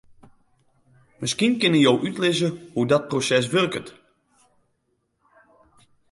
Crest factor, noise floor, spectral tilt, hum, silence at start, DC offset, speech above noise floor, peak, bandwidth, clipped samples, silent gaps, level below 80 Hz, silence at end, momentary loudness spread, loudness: 18 dB; -72 dBFS; -4.5 dB/octave; none; 1.2 s; under 0.1%; 51 dB; -6 dBFS; 11.5 kHz; under 0.1%; none; -64 dBFS; 2.2 s; 9 LU; -21 LUFS